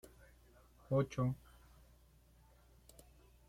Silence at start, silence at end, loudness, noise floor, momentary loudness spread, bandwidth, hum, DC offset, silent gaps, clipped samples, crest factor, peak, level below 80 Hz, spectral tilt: 0.9 s; 2.15 s; -39 LUFS; -66 dBFS; 27 LU; 15.5 kHz; none; under 0.1%; none; under 0.1%; 20 dB; -24 dBFS; -64 dBFS; -8 dB/octave